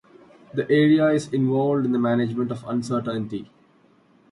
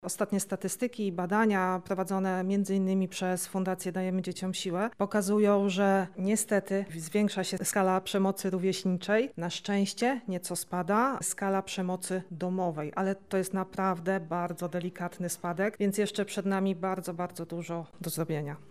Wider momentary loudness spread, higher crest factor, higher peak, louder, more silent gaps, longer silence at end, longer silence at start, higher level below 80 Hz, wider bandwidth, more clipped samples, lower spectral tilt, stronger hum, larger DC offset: first, 12 LU vs 8 LU; about the same, 16 dB vs 16 dB; first, -8 dBFS vs -14 dBFS; first, -22 LUFS vs -31 LUFS; neither; first, 0.85 s vs 0.05 s; first, 0.55 s vs 0 s; first, -64 dBFS vs -72 dBFS; second, 11.5 kHz vs 15.5 kHz; neither; first, -7.5 dB/octave vs -5 dB/octave; neither; second, under 0.1% vs 0.1%